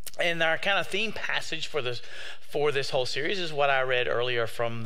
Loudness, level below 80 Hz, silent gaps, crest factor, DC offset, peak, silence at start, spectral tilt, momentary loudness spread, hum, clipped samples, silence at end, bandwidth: -27 LUFS; -62 dBFS; none; 18 dB; 3%; -10 dBFS; 0.05 s; -3.5 dB/octave; 9 LU; none; under 0.1%; 0 s; 16 kHz